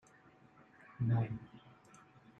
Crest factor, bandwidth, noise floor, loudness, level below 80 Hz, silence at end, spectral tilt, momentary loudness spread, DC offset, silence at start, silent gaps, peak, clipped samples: 18 dB; 7.4 kHz; -64 dBFS; -38 LUFS; -68 dBFS; 0.8 s; -9 dB/octave; 26 LU; under 0.1%; 1 s; none; -24 dBFS; under 0.1%